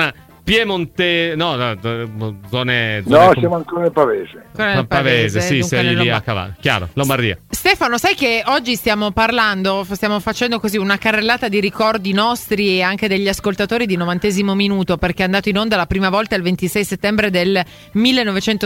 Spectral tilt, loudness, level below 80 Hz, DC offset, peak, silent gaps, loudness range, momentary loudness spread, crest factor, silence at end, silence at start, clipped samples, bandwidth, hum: -5 dB/octave; -16 LUFS; -40 dBFS; under 0.1%; -2 dBFS; none; 2 LU; 6 LU; 16 dB; 0 s; 0 s; under 0.1%; 17 kHz; none